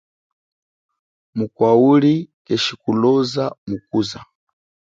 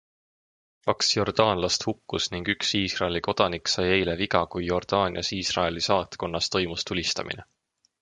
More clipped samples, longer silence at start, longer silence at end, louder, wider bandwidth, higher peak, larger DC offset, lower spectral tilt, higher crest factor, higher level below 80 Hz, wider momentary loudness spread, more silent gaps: neither; first, 1.35 s vs 0.85 s; about the same, 0.6 s vs 0.6 s; first, -18 LUFS vs -25 LUFS; second, 7.8 kHz vs 11 kHz; about the same, -2 dBFS vs -2 dBFS; neither; first, -6.5 dB/octave vs -3.5 dB/octave; second, 18 dB vs 24 dB; second, -60 dBFS vs -48 dBFS; first, 14 LU vs 6 LU; first, 2.34-2.45 s, 3.58-3.67 s vs none